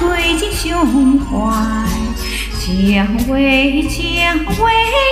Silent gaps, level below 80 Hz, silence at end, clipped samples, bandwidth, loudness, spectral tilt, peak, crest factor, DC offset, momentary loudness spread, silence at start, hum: none; -24 dBFS; 0 s; under 0.1%; 16 kHz; -14 LUFS; -4.5 dB/octave; -2 dBFS; 12 dB; under 0.1%; 8 LU; 0 s; none